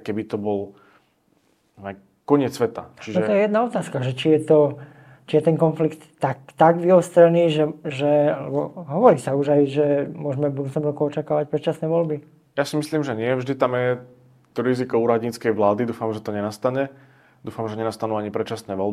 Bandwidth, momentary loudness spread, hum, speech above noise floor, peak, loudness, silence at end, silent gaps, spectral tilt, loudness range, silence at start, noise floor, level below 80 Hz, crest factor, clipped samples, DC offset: 14.5 kHz; 12 LU; none; 43 dB; -2 dBFS; -21 LUFS; 0 s; none; -7 dB/octave; 6 LU; 0.05 s; -63 dBFS; -66 dBFS; 20 dB; under 0.1%; under 0.1%